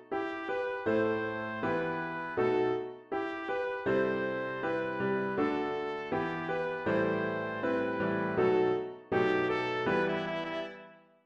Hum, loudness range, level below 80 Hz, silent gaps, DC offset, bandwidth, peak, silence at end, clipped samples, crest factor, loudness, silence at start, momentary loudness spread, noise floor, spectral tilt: none; 2 LU; -66 dBFS; none; under 0.1%; 7.2 kHz; -16 dBFS; 0.3 s; under 0.1%; 16 dB; -32 LUFS; 0 s; 7 LU; -54 dBFS; -7.5 dB/octave